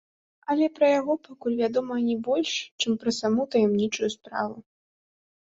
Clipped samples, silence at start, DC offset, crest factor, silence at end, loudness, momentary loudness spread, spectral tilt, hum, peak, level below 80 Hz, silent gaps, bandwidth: under 0.1%; 0.5 s; under 0.1%; 16 dB; 1 s; -26 LUFS; 9 LU; -4.5 dB/octave; none; -10 dBFS; -68 dBFS; 2.71-2.78 s; 7.8 kHz